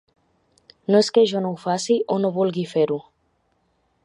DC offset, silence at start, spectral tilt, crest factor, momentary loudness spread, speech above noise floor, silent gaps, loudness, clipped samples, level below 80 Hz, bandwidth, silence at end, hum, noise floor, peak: under 0.1%; 0.9 s; -5.5 dB/octave; 18 dB; 8 LU; 47 dB; none; -21 LUFS; under 0.1%; -70 dBFS; 11 kHz; 1.05 s; none; -67 dBFS; -4 dBFS